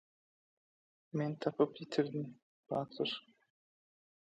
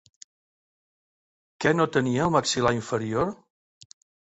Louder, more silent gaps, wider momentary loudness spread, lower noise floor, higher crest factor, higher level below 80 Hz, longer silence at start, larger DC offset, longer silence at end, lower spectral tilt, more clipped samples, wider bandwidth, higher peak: second, -38 LUFS vs -24 LUFS; first, 2.42-2.63 s vs none; first, 9 LU vs 6 LU; about the same, under -90 dBFS vs under -90 dBFS; about the same, 24 dB vs 20 dB; second, -84 dBFS vs -56 dBFS; second, 1.15 s vs 1.6 s; neither; first, 1.1 s vs 0.95 s; first, -7 dB/octave vs -5 dB/octave; neither; about the same, 8.4 kHz vs 8.2 kHz; second, -18 dBFS vs -8 dBFS